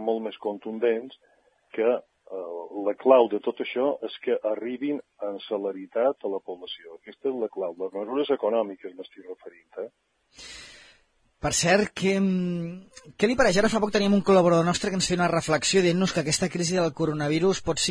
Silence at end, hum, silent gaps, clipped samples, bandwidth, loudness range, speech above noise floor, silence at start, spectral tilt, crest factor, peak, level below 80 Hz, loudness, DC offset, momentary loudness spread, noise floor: 0 s; none; none; under 0.1%; 10.5 kHz; 8 LU; 38 dB; 0 s; -4.5 dB/octave; 22 dB; -4 dBFS; -54 dBFS; -25 LUFS; under 0.1%; 19 LU; -64 dBFS